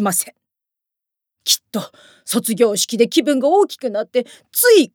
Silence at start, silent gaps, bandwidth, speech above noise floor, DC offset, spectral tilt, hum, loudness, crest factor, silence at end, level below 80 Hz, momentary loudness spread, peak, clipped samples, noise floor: 0 s; none; over 20 kHz; 67 dB; under 0.1%; -2.5 dB/octave; none; -17 LUFS; 16 dB; 0.1 s; -80 dBFS; 13 LU; -2 dBFS; under 0.1%; -84 dBFS